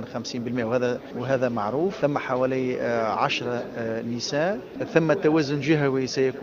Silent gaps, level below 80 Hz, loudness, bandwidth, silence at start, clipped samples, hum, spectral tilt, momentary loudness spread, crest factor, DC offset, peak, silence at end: none; -60 dBFS; -25 LUFS; 12.5 kHz; 0 s; under 0.1%; none; -6 dB/octave; 8 LU; 22 dB; under 0.1%; -2 dBFS; 0 s